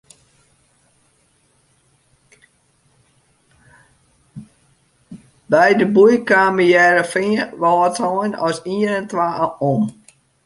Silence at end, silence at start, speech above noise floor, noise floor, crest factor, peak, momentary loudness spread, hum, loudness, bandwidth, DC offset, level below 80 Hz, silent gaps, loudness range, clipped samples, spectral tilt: 0.55 s; 4.35 s; 44 dB; -60 dBFS; 18 dB; -2 dBFS; 9 LU; none; -16 LUFS; 11.5 kHz; under 0.1%; -62 dBFS; none; 5 LU; under 0.1%; -5.5 dB/octave